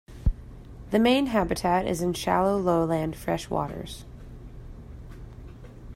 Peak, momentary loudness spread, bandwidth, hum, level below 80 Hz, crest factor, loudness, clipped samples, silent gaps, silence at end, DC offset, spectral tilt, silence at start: -10 dBFS; 22 LU; 16 kHz; none; -40 dBFS; 18 dB; -26 LUFS; under 0.1%; none; 0 s; under 0.1%; -6 dB/octave; 0.1 s